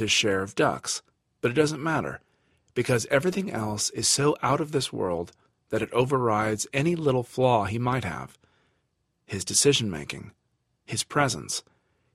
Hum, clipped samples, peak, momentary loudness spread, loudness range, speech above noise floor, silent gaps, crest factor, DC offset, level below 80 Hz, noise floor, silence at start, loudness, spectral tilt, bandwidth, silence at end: none; under 0.1%; -6 dBFS; 12 LU; 2 LU; 49 dB; none; 20 dB; under 0.1%; -58 dBFS; -75 dBFS; 0 s; -26 LUFS; -3.5 dB/octave; 14.5 kHz; 0.55 s